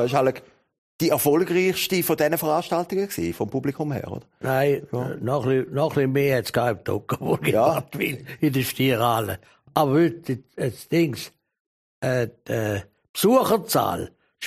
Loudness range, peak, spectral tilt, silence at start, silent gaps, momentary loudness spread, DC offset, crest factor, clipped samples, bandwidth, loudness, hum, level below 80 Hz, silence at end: 3 LU; -4 dBFS; -5.5 dB/octave; 0 s; 0.78-0.99 s, 11.60-12.02 s, 13.09-13.14 s; 11 LU; under 0.1%; 20 dB; under 0.1%; 15.5 kHz; -23 LUFS; none; -58 dBFS; 0 s